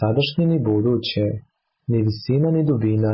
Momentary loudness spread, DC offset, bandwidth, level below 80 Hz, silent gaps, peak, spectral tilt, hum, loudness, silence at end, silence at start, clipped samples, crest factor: 6 LU; under 0.1%; 5.8 kHz; -48 dBFS; none; -10 dBFS; -12 dB/octave; none; -20 LUFS; 0 s; 0 s; under 0.1%; 10 dB